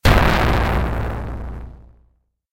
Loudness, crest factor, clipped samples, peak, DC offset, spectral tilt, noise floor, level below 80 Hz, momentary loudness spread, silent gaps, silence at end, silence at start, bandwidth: -19 LUFS; 18 dB; under 0.1%; -2 dBFS; under 0.1%; -6 dB/octave; -61 dBFS; -24 dBFS; 20 LU; none; 0.7 s; 0.05 s; 16.5 kHz